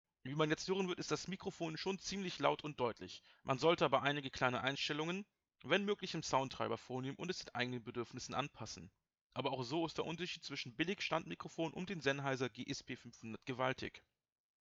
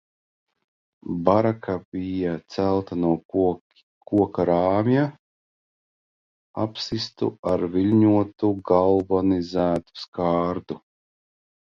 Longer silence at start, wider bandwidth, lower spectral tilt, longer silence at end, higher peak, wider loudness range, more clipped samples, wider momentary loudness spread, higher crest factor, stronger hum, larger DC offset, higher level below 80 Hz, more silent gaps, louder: second, 0.25 s vs 1.05 s; first, 8 kHz vs 7.2 kHz; second, -4.5 dB/octave vs -8 dB/octave; second, 0.6 s vs 0.9 s; second, -18 dBFS vs -2 dBFS; about the same, 5 LU vs 4 LU; neither; about the same, 12 LU vs 10 LU; about the same, 24 dB vs 22 dB; neither; neither; second, -72 dBFS vs -50 dBFS; second, 9.21-9.30 s vs 1.85-1.92 s, 3.25-3.29 s, 3.61-3.70 s, 3.83-4.01 s, 5.19-6.54 s, 7.39-7.43 s, 10.08-10.12 s; second, -40 LUFS vs -23 LUFS